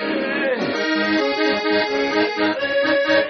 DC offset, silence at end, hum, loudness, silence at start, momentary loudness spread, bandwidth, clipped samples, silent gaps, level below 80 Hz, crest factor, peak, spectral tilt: under 0.1%; 0 s; none; -19 LUFS; 0 s; 3 LU; 6.6 kHz; under 0.1%; none; -60 dBFS; 14 dB; -4 dBFS; -1.5 dB/octave